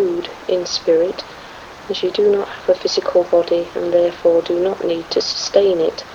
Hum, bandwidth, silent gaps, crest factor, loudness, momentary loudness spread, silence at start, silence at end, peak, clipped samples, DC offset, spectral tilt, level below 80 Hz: none; 7.8 kHz; none; 18 dB; -17 LUFS; 10 LU; 0 s; 0 s; 0 dBFS; under 0.1%; under 0.1%; -4 dB/octave; -52 dBFS